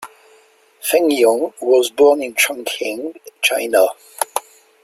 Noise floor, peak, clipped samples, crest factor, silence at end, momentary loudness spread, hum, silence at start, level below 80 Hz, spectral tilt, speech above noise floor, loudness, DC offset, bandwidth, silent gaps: -52 dBFS; 0 dBFS; under 0.1%; 18 dB; 0.45 s; 12 LU; none; 0 s; -66 dBFS; -1 dB/octave; 36 dB; -17 LUFS; under 0.1%; 16 kHz; none